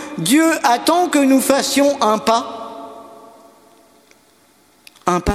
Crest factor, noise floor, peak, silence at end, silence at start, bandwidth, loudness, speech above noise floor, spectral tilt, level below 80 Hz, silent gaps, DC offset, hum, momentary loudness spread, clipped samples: 18 dB; -53 dBFS; 0 dBFS; 0 s; 0 s; 16 kHz; -15 LUFS; 39 dB; -3.5 dB/octave; -40 dBFS; none; under 0.1%; none; 17 LU; under 0.1%